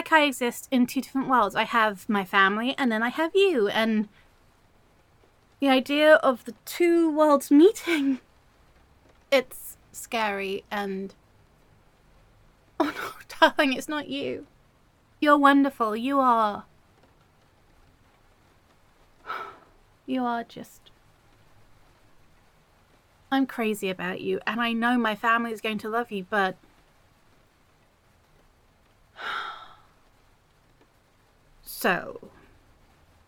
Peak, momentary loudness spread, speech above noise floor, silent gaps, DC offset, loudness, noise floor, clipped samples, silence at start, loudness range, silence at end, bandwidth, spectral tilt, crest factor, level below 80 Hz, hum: -4 dBFS; 18 LU; 38 dB; none; under 0.1%; -24 LUFS; -62 dBFS; under 0.1%; 0 s; 18 LU; 1 s; 17.5 kHz; -4 dB/octave; 22 dB; -64 dBFS; none